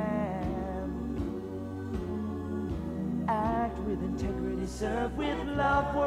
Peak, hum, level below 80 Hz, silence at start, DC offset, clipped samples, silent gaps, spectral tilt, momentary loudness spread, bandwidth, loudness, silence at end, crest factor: -16 dBFS; none; -42 dBFS; 0 s; under 0.1%; under 0.1%; none; -7 dB/octave; 7 LU; 14.5 kHz; -33 LUFS; 0 s; 16 dB